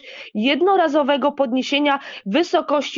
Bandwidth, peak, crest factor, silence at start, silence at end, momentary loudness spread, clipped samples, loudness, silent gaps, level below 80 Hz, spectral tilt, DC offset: 7.6 kHz; -6 dBFS; 14 dB; 0.05 s; 0 s; 6 LU; under 0.1%; -19 LUFS; none; -76 dBFS; -4.5 dB/octave; under 0.1%